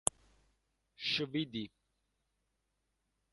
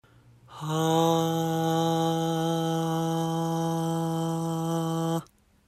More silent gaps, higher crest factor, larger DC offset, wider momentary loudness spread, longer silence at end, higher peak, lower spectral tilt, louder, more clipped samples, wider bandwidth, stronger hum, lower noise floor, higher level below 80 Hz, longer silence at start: neither; first, 38 dB vs 16 dB; neither; first, 10 LU vs 5 LU; first, 1.65 s vs 0.45 s; first, -6 dBFS vs -10 dBFS; second, -2.5 dB/octave vs -6 dB/octave; second, -37 LUFS vs -27 LUFS; neither; second, 11.5 kHz vs 14.5 kHz; neither; first, -83 dBFS vs -55 dBFS; second, -72 dBFS vs -66 dBFS; first, 1 s vs 0.5 s